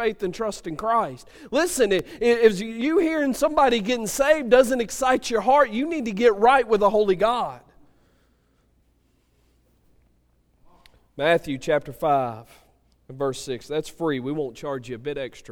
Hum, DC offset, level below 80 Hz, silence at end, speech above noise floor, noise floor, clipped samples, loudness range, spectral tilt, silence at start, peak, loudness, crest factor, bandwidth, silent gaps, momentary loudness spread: none; under 0.1%; -50 dBFS; 0 s; 42 dB; -64 dBFS; under 0.1%; 10 LU; -4.5 dB/octave; 0 s; -4 dBFS; -22 LUFS; 20 dB; 18 kHz; none; 13 LU